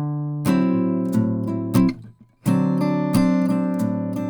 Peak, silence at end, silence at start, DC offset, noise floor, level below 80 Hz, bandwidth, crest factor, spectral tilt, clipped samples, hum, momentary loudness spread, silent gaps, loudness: -6 dBFS; 0 s; 0 s; under 0.1%; -44 dBFS; -50 dBFS; over 20 kHz; 16 dB; -8 dB/octave; under 0.1%; none; 5 LU; none; -21 LUFS